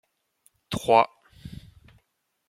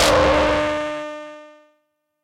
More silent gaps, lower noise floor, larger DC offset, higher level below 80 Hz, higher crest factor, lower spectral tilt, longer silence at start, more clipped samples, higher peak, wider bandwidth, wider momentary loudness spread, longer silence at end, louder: neither; first, -74 dBFS vs -70 dBFS; neither; second, -56 dBFS vs -36 dBFS; first, 24 dB vs 16 dB; first, -5 dB/octave vs -3.5 dB/octave; first, 0.7 s vs 0 s; neither; about the same, -4 dBFS vs -4 dBFS; about the same, 16 kHz vs 16 kHz; first, 24 LU vs 20 LU; first, 1 s vs 0.75 s; second, -23 LUFS vs -19 LUFS